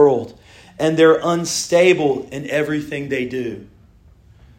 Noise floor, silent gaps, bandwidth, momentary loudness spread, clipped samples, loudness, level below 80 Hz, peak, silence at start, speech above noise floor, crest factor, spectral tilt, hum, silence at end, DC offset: -49 dBFS; none; 16.5 kHz; 12 LU; under 0.1%; -18 LUFS; -54 dBFS; 0 dBFS; 0 s; 32 dB; 18 dB; -4.5 dB/octave; none; 0.95 s; under 0.1%